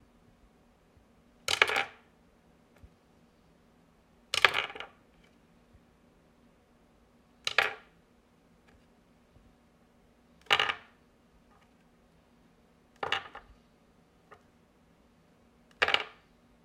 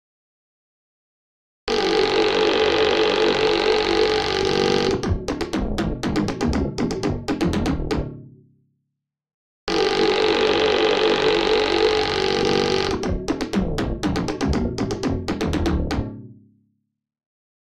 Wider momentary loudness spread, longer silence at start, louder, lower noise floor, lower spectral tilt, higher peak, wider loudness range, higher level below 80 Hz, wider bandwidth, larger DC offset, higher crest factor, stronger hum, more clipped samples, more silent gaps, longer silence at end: first, 19 LU vs 7 LU; second, 1.5 s vs 1.65 s; second, -29 LUFS vs -21 LUFS; second, -64 dBFS vs -80 dBFS; second, -0.5 dB/octave vs -5 dB/octave; first, -2 dBFS vs -6 dBFS; about the same, 9 LU vs 7 LU; second, -68 dBFS vs -34 dBFS; first, 16 kHz vs 12.5 kHz; neither; first, 36 dB vs 16 dB; neither; neither; second, none vs 9.34-9.67 s; second, 0.55 s vs 1.35 s